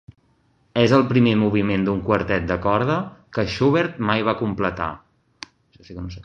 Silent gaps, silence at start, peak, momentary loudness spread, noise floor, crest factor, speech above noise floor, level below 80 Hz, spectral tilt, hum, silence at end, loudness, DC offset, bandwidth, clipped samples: none; 0.75 s; -2 dBFS; 18 LU; -62 dBFS; 20 dB; 42 dB; -44 dBFS; -7.5 dB/octave; none; 0 s; -20 LUFS; under 0.1%; 7.8 kHz; under 0.1%